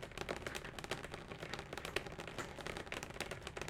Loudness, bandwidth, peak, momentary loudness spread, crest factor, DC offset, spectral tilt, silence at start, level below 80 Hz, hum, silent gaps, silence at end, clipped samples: -45 LUFS; 17.5 kHz; -18 dBFS; 4 LU; 28 dB; under 0.1%; -3.5 dB/octave; 0 s; -60 dBFS; none; none; 0 s; under 0.1%